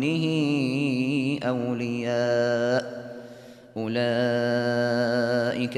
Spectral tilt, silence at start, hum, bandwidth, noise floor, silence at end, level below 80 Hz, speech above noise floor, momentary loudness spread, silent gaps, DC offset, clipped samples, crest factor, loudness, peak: -6.5 dB/octave; 0 s; none; 12.5 kHz; -46 dBFS; 0 s; -68 dBFS; 21 dB; 13 LU; none; under 0.1%; under 0.1%; 12 dB; -25 LUFS; -12 dBFS